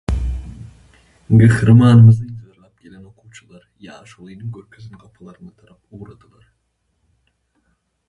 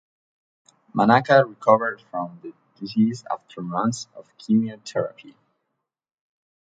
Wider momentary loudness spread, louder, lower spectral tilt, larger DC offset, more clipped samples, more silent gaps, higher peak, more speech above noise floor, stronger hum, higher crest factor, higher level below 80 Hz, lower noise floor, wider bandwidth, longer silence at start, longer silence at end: first, 27 LU vs 19 LU; first, -12 LUFS vs -22 LUFS; first, -8.5 dB/octave vs -6 dB/octave; neither; neither; neither; about the same, 0 dBFS vs -2 dBFS; about the same, 54 dB vs 57 dB; neither; about the same, 18 dB vs 22 dB; first, -34 dBFS vs -68 dBFS; second, -68 dBFS vs -79 dBFS; first, 11 kHz vs 9 kHz; second, 0.1 s vs 0.95 s; first, 2.05 s vs 1.4 s